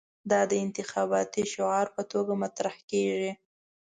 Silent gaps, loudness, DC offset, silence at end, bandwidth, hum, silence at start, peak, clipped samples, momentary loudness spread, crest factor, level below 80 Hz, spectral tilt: 2.83-2.88 s; -29 LUFS; under 0.1%; 0.45 s; 9.6 kHz; none; 0.25 s; -10 dBFS; under 0.1%; 6 LU; 18 dB; -72 dBFS; -4.5 dB/octave